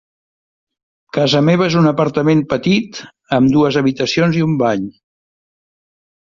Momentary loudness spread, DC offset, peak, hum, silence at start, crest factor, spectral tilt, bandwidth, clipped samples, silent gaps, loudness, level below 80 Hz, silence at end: 10 LU; under 0.1%; 0 dBFS; none; 1.15 s; 16 dB; -6.5 dB/octave; 7.4 kHz; under 0.1%; none; -15 LUFS; -50 dBFS; 1.4 s